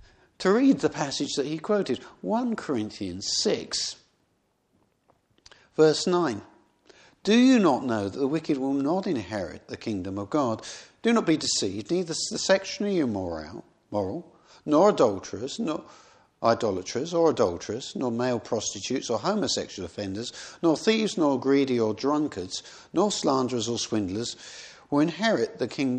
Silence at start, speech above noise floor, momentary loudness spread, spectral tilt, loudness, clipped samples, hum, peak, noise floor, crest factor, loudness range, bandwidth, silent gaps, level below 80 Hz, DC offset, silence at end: 0.4 s; 45 dB; 13 LU; -4.5 dB/octave; -26 LUFS; under 0.1%; none; -6 dBFS; -71 dBFS; 20 dB; 4 LU; 9.8 kHz; none; -64 dBFS; under 0.1%; 0 s